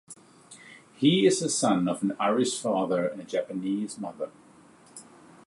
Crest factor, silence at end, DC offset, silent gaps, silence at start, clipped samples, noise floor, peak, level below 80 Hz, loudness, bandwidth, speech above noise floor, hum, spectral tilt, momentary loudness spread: 18 dB; 0.45 s; under 0.1%; none; 0.1 s; under 0.1%; -55 dBFS; -10 dBFS; -74 dBFS; -26 LUFS; 11.5 kHz; 29 dB; none; -4.5 dB/octave; 25 LU